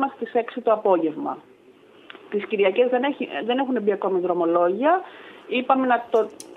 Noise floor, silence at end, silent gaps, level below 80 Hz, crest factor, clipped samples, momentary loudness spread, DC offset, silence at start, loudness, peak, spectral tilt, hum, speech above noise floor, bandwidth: -51 dBFS; 0 s; none; -78 dBFS; 18 dB; under 0.1%; 10 LU; under 0.1%; 0 s; -22 LUFS; -4 dBFS; -6 dB/octave; none; 29 dB; 12 kHz